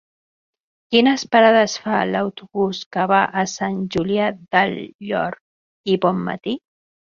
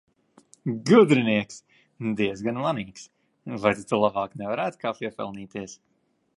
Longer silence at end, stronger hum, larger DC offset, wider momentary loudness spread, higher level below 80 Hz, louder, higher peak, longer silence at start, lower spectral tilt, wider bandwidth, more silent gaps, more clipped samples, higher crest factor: about the same, 0.5 s vs 0.6 s; neither; neither; second, 13 LU vs 19 LU; first, -58 dBFS vs -64 dBFS; first, -19 LUFS vs -24 LUFS; about the same, -2 dBFS vs -4 dBFS; first, 0.9 s vs 0.65 s; about the same, -5 dB/octave vs -6 dB/octave; second, 7.4 kHz vs 11.5 kHz; first, 2.86-2.91 s, 4.95-4.99 s, 5.41-5.84 s vs none; neither; about the same, 18 dB vs 22 dB